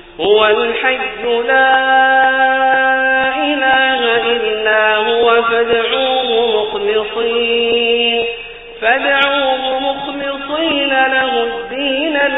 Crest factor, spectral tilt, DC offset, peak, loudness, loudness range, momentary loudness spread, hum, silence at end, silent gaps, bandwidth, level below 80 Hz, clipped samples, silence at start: 14 dB; 1.5 dB/octave; under 0.1%; 0 dBFS; -13 LUFS; 3 LU; 7 LU; none; 0 s; none; 4 kHz; -46 dBFS; under 0.1%; 0.05 s